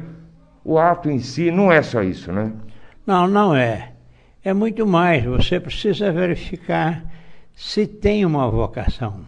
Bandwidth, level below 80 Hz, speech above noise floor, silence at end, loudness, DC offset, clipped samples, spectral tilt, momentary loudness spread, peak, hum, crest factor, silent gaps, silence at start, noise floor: 9.6 kHz; -36 dBFS; 30 dB; 0 s; -19 LUFS; under 0.1%; under 0.1%; -7 dB/octave; 13 LU; 0 dBFS; none; 18 dB; none; 0 s; -48 dBFS